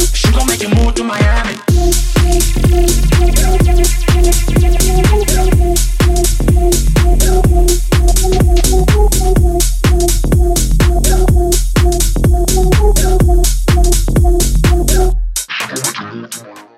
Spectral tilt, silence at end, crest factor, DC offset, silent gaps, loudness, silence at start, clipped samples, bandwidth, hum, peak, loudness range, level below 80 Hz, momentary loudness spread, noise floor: -5 dB/octave; 0.15 s; 10 dB; under 0.1%; none; -12 LUFS; 0 s; under 0.1%; 16 kHz; none; 0 dBFS; 1 LU; -12 dBFS; 3 LU; -30 dBFS